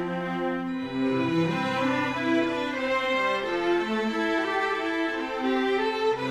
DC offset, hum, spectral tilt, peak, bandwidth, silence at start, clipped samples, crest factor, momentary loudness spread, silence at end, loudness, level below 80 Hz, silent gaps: under 0.1%; none; -5.5 dB/octave; -14 dBFS; 12.5 kHz; 0 s; under 0.1%; 14 dB; 4 LU; 0 s; -26 LUFS; -58 dBFS; none